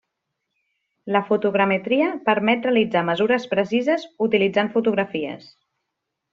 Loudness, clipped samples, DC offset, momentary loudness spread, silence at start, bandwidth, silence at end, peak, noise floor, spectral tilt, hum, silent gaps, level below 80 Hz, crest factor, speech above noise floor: -21 LUFS; under 0.1%; under 0.1%; 6 LU; 1.05 s; 7.4 kHz; 0.95 s; -4 dBFS; -80 dBFS; -3.5 dB/octave; none; none; -66 dBFS; 18 dB; 59 dB